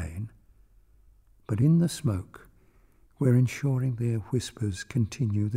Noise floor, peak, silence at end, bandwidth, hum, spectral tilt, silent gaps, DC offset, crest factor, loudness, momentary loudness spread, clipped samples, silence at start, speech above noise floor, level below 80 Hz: -59 dBFS; -12 dBFS; 0 s; 15 kHz; none; -7 dB/octave; none; under 0.1%; 16 dB; -27 LUFS; 13 LU; under 0.1%; 0 s; 34 dB; -52 dBFS